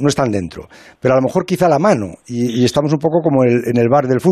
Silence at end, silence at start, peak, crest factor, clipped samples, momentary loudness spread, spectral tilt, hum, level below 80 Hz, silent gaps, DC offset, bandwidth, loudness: 0 s; 0 s; -2 dBFS; 14 dB; under 0.1%; 8 LU; -6.5 dB/octave; none; -50 dBFS; none; under 0.1%; 14 kHz; -15 LUFS